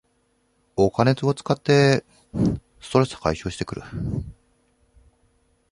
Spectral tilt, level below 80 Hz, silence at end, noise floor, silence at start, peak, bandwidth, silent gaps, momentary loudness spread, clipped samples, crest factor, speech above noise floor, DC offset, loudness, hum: -6.5 dB/octave; -44 dBFS; 1.4 s; -67 dBFS; 0.75 s; -2 dBFS; 11 kHz; none; 15 LU; under 0.1%; 22 dB; 45 dB; under 0.1%; -23 LUFS; none